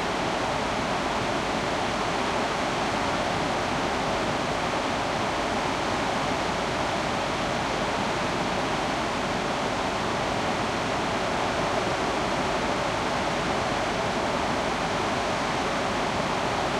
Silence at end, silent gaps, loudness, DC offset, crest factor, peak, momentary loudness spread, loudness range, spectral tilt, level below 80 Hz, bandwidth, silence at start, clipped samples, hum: 0 s; none; -26 LUFS; under 0.1%; 14 dB; -14 dBFS; 1 LU; 1 LU; -4 dB/octave; -46 dBFS; 15.5 kHz; 0 s; under 0.1%; none